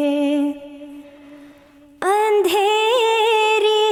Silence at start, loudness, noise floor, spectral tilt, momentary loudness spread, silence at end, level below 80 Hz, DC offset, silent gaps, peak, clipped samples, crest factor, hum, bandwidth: 0 s; -17 LUFS; -48 dBFS; -1.5 dB/octave; 19 LU; 0 s; -66 dBFS; under 0.1%; none; -8 dBFS; under 0.1%; 12 dB; none; 18 kHz